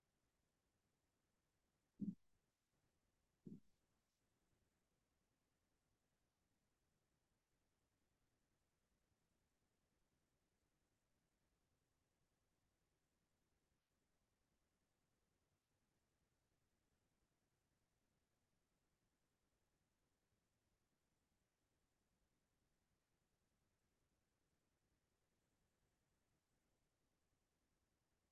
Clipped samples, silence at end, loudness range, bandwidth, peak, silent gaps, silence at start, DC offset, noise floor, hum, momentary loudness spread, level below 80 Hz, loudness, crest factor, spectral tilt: under 0.1%; 24.6 s; 0 LU; 2.2 kHz; -38 dBFS; none; 2 s; under 0.1%; -90 dBFS; none; 14 LU; under -90 dBFS; -56 LUFS; 32 dB; -10.5 dB/octave